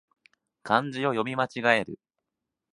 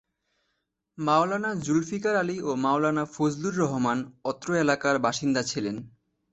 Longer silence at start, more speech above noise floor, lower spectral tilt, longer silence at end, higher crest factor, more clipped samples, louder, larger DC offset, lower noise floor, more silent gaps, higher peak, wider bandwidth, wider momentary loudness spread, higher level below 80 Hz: second, 0.65 s vs 1 s; first, 60 dB vs 53 dB; about the same, -5.5 dB/octave vs -5 dB/octave; first, 0.8 s vs 0.45 s; first, 26 dB vs 18 dB; neither; about the same, -26 LUFS vs -26 LUFS; neither; first, -86 dBFS vs -79 dBFS; neither; first, -4 dBFS vs -8 dBFS; first, 11 kHz vs 8.2 kHz; first, 18 LU vs 8 LU; second, -70 dBFS vs -64 dBFS